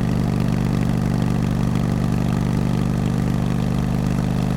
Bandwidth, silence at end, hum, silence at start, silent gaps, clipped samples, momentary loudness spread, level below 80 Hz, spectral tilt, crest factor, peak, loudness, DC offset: 16 kHz; 0 s; none; 0 s; none; under 0.1%; 1 LU; -32 dBFS; -7.5 dB/octave; 12 dB; -8 dBFS; -21 LUFS; under 0.1%